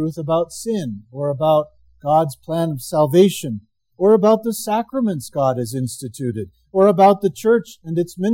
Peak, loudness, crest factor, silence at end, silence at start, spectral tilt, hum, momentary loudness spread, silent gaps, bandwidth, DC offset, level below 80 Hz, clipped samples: -2 dBFS; -18 LUFS; 16 dB; 0 s; 0 s; -6.5 dB/octave; none; 13 LU; none; 17 kHz; under 0.1%; -58 dBFS; under 0.1%